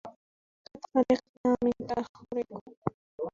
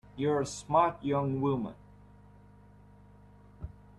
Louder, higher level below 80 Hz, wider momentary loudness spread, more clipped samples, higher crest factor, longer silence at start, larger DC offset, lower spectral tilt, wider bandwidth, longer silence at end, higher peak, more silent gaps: about the same, -31 LUFS vs -30 LUFS; about the same, -62 dBFS vs -58 dBFS; second, 13 LU vs 21 LU; neither; about the same, 20 dB vs 20 dB; about the same, 0.05 s vs 0.1 s; neither; about the same, -7.5 dB/octave vs -6.5 dB/octave; second, 7.4 kHz vs 12 kHz; second, 0.05 s vs 0.3 s; about the same, -12 dBFS vs -12 dBFS; first, 0.16-0.65 s, 1.29-1.44 s, 2.09-2.14 s, 2.61-2.66 s, 2.77-2.82 s, 2.94-3.18 s vs none